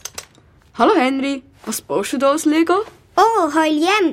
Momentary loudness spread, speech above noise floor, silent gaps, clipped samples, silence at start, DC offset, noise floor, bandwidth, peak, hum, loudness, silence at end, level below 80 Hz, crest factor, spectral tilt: 13 LU; 34 dB; none; under 0.1%; 0.15 s; under 0.1%; -50 dBFS; 16.5 kHz; -2 dBFS; none; -17 LUFS; 0 s; -56 dBFS; 16 dB; -3 dB/octave